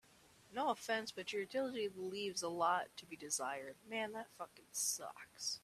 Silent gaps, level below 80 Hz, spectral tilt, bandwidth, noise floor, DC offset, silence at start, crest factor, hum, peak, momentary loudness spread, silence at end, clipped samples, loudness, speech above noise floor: none; -84 dBFS; -1.5 dB/octave; 14.5 kHz; -67 dBFS; under 0.1%; 0.5 s; 20 dB; none; -24 dBFS; 12 LU; 0.05 s; under 0.1%; -41 LUFS; 24 dB